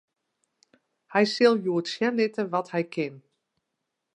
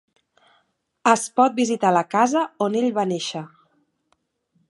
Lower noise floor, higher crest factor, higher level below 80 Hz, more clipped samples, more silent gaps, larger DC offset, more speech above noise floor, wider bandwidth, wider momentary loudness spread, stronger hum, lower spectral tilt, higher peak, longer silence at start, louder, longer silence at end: first, -82 dBFS vs -69 dBFS; about the same, 20 dB vs 22 dB; about the same, -80 dBFS vs -76 dBFS; neither; neither; neither; first, 57 dB vs 49 dB; about the same, 10.5 kHz vs 11.5 kHz; about the same, 10 LU vs 9 LU; neither; about the same, -5.5 dB/octave vs -4.5 dB/octave; second, -8 dBFS vs -2 dBFS; about the same, 1.1 s vs 1.05 s; second, -25 LUFS vs -21 LUFS; second, 0.95 s vs 1.2 s